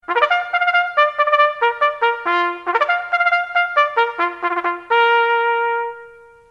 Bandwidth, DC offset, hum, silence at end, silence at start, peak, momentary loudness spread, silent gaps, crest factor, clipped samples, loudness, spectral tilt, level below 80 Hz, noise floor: 7.6 kHz; under 0.1%; none; 0.4 s; 0.1 s; 0 dBFS; 6 LU; none; 16 dB; under 0.1%; -17 LUFS; -2.5 dB/octave; -66 dBFS; -42 dBFS